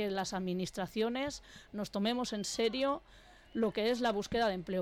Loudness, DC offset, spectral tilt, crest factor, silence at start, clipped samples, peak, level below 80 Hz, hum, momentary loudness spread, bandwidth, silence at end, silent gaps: -35 LUFS; under 0.1%; -4.5 dB/octave; 10 dB; 0 s; under 0.1%; -24 dBFS; -60 dBFS; none; 9 LU; 16.5 kHz; 0 s; none